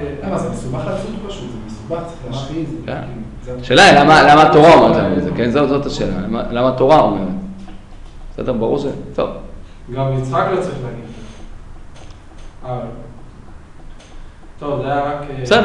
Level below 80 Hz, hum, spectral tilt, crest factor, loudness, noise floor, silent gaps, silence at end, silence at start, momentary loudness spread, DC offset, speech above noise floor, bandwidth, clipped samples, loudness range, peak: -34 dBFS; none; -5.5 dB/octave; 16 dB; -14 LUFS; -35 dBFS; none; 0 s; 0 s; 22 LU; under 0.1%; 21 dB; 11 kHz; under 0.1%; 19 LU; 0 dBFS